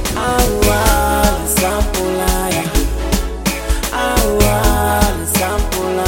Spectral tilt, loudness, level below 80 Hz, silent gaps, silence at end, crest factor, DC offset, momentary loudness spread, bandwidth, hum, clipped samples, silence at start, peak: -4 dB/octave; -15 LUFS; -20 dBFS; none; 0 s; 14 dB; 0.3%; 5 LU; 17 kHz; none; under 0.1%; 0 s; 0 dBFS